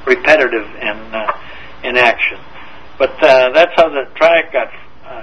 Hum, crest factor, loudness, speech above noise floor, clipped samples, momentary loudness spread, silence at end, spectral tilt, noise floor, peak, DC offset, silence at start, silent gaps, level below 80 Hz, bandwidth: none; 14 dB; -12 LUFS; 23 dB; 0.3%; 16 LU; 0 s; -4 dB/octave; -36 dBFS; 0 dBFS; 3%; 0.05 s; none; -46 dBFS; 8.4 kHz